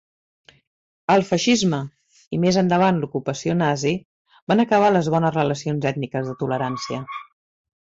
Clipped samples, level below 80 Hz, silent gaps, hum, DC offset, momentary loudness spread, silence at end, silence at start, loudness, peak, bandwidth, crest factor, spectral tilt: under 0.1%; -58 dBFS; 2.27-2.31 s, 4.05-4.25 s, 4.42-4.47 s; none; under 0.1%; 12 LU; 0.75 s; 1.1 s; -21 LUFS; -6 dBFS; 7.8 kHz; 16 dB; -5.5 dB/octave